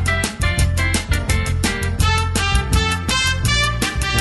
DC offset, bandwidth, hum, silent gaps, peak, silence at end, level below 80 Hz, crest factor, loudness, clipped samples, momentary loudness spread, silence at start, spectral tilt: under 0.1%; 12.5 kHz; none; none; -2 dBFS; 0 s; -24 dBFS; 16 dB; -18 LUFS; under 0.1%; 3 LU; 0 s; -3.5 dB/octave